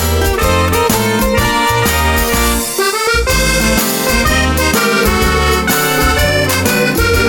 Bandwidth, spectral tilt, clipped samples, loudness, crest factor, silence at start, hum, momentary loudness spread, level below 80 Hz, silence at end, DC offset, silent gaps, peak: 19.5 kHz; -3.5 dB/octave; under 0.1%; -12 LUFS; 12 dB; 0 s; none; 2 LU; -20 dBFS; 0 s; under 0.1%; none; 0 dBFS